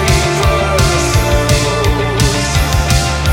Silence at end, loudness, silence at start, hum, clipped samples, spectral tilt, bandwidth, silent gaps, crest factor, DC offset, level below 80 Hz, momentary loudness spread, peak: 0 s; -13 LUFS; 0 s; none; under 0.1%; -4.5 dB/octave; 17 kHz; none; 12 dB; under 0.1%; -18 dBFS; 2 LU; 0 dBFS